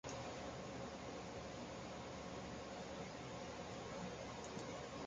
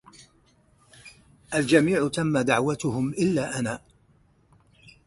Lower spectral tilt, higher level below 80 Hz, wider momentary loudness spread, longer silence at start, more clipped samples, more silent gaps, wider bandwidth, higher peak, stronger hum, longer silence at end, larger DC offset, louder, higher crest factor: about the same, -4.5 dB/octave vs -5.5 dB/octave; second, -66 dBFS vs -58 dBFS; second, 1 LU vs 10 LU; second, 0.05 s vs 1.05 s; neither; neither; second, 9.4 kHz vs 11.5 kHz; second, -34 dBFS vs -6 dBFS; neither; second, 0 s vs 1.3 s; neither; second, -50 LUFS vs -24 LUFS; second, 14 dB vs 20 dB